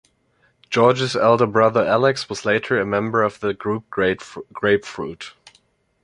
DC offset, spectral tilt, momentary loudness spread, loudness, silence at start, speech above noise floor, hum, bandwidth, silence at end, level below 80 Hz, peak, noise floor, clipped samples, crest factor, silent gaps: under 0.1%; -5.5 dB/octave; 14 LU; -19 LUFS; 0.7 s; 43 dB; none; 11 kHz; 0.75 s; -54 dBFS; -2 dBFS; -62 dBFS; under 0.1%; 18 dB; none